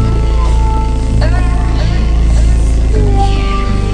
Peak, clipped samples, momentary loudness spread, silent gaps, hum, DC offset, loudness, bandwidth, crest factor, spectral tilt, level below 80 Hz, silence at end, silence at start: 0 dBFS; under 0.1%; 3 LU; none; none; under 0.1%; -13 LUFS; 9.8 kHz; 10 dB; -7 dB/octave; -10 dBFS; 0 s; 0 s